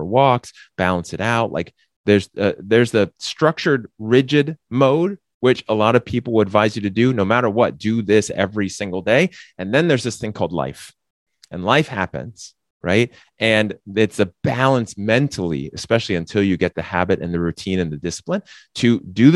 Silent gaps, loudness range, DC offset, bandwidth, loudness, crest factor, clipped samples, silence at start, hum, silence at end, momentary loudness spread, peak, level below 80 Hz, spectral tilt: 1.96-2.04 s, 5.34-5.41 s, 11.10-11.26 s, 12.70-12.80 s; 4 LU; under 0.1%; 12 kHz; -19 LUFS; 18 dB; under 0.1%; 0 s; none; 0 s; 10 LU; 0 dBFS; -50 dBFS; -6 dB/octave